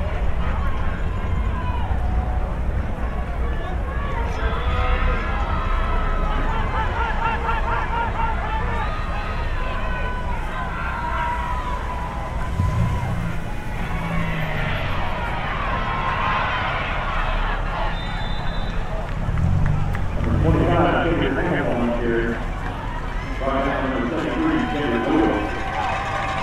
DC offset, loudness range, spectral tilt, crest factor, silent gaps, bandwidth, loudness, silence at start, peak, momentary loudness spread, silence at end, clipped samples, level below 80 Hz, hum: under 0.1%; 4 LU; -7 dB/octave; 16 dB; none; 10 kHz; -24 LUFS; 0 s; -6 dBFS; 6 LU; 0 s; under 0.1%; -26 dBFS; none